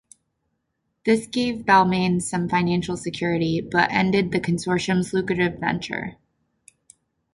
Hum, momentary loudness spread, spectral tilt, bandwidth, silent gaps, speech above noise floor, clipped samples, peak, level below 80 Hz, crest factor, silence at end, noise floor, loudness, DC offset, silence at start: none; 9 LU; -5.5 dB/octave; 11.5 kHz; none; 54 dB; under 0.1%; -4 dBFS; -52 dBFS; 20 dB; 1.2 s; -75 dBFS; -22 LUFS; under 0.1%; 1.05 s